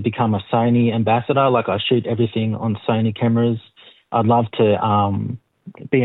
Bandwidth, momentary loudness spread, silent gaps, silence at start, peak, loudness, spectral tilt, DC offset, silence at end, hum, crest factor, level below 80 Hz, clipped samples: 4.1 kHz; 7 LU; none; 0 s; -4 dBFS; -19 LUFS; -11 dB/octave; under 0.1%; 0 s; none; 14 dB; -64 dBFS; under 0.1%